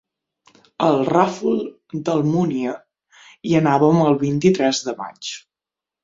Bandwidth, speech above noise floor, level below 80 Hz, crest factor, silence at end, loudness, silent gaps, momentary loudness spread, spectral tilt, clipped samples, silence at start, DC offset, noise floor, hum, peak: 7.8 kHz; 70 dB; -60 dBFS; 18 dB; 0.65 s; -19 LUFS; none; 15 LU; -6 dB/octave; under 0.1%; 0.8 s; under 0.1%; -88 dBFS; none; -2 dBFS